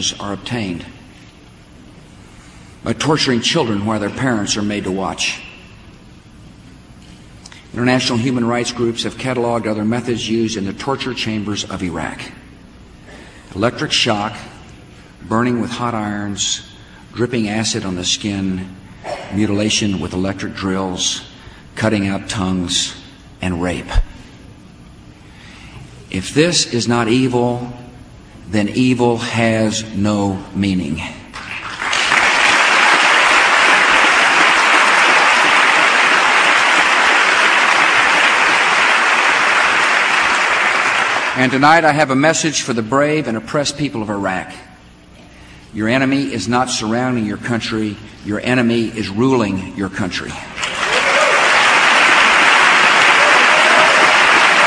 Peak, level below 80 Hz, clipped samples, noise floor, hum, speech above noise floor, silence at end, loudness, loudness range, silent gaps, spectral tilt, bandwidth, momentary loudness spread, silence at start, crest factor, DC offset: 0 dBFS; -38 dBFS; under 0.1%; -42 dBFS; none; 24 dB; 0 s; -14 LUFS; 12 LU; none; -3 dB/octave; 11 kHz; 14 LU; 0 s; 16 dB; under 0.1%